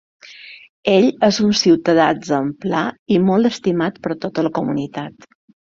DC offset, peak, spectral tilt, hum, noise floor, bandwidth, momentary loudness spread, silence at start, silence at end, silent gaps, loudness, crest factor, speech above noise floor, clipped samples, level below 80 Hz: under 0.1%; -2 dBFS; -5.5 dB/octave; none; -40 dBFS; 7.6 kHz; 17 LU; 0.25 s; 0.65 s; 0.69-0.83 s, 2.99-3.06 s; -17 LUFS; 16 dB; 23 dB; under 0.1%; -56 dBFS